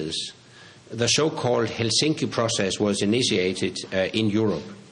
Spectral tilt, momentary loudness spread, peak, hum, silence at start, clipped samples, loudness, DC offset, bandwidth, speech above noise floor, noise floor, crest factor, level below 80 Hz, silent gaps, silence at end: -4 dB/octave; 8 LU; -8 dBFS; none; 0 s; under 0.1%; -23 LUFS; under 0.1%; 10.5 kHz; 25 dB; -48 dBFS; 16 dB; -62 dBFS; none; 0.05 s